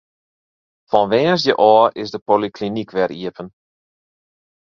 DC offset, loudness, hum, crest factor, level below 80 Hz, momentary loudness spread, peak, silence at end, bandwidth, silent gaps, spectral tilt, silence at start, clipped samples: under 0.1%; -16 LUFS; none; 18 dB; -60 dBFS; 16 LU; 0 dBFS; 1.2 s; 7.2 kHz; 2.22-2.26 s; -6 dB/octave; 0.9 s; under 0.1%